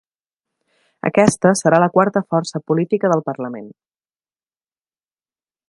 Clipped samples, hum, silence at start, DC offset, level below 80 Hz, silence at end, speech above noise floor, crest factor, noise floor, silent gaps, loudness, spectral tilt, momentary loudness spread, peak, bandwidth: under 0.1%; none; 1.05 s; under 0.1%; -58 dBFS; 2 s; over 73 dB; 20 dB; under -90 dBFS; none; -17 LUFS; -6 dB/octave; 13 LU; 0 dBFS; 11.5 kHz